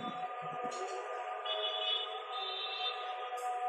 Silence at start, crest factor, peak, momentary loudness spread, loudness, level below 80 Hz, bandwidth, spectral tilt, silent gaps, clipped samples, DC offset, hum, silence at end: 0 s; 16 dB; -24 dBFS; 7 LU; -37 LUFS; under -90 dBFS; 14.5 kHz; -2 dB/octave; none; under 0.1%; under 0.1%; none; 0 s